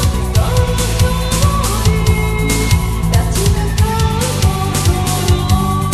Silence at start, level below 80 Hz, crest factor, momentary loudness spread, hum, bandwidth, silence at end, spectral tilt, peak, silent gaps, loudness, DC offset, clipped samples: 0 s; -18 dBFS; 12 dB; 2 LU; none; 13 kHz; 0 s; -5 dB/octave; 0 dBFS; none; -14 LUFS; under 0.1%; under 0.1%